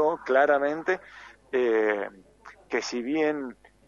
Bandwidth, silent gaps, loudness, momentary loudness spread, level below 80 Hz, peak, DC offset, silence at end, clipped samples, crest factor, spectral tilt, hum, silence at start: 7.6 kHz; none; -26 LUFS; 12 LU; -66 dBFS; -8 dBFS; under 0.1%; 0.35 s; under 0.1%; 18 dB; -4 dB/octave; none; 0 s